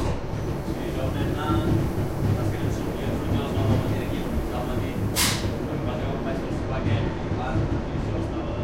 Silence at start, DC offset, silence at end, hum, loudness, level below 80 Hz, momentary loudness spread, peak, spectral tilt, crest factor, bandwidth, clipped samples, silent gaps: 0 s; under 0.1%; 0 s; none; -26 LUFS; -34 dBFS; 5 LU; -10 dBFS; -5.5 dB/octave; 16 dB; 16 kHz; under 0.1%; none